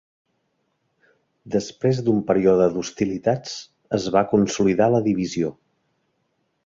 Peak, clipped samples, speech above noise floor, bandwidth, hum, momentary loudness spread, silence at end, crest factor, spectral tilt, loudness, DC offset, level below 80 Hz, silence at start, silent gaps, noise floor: -4 dBFS; under 0.1%; 51 dB; 7.8 kHz; none; 9 LU; 1.15 s; 18 dB; -6 dB/octave; -21 LUFS; under 0.1%; -56 dBFS; 1.45 s; none; -71 dBFS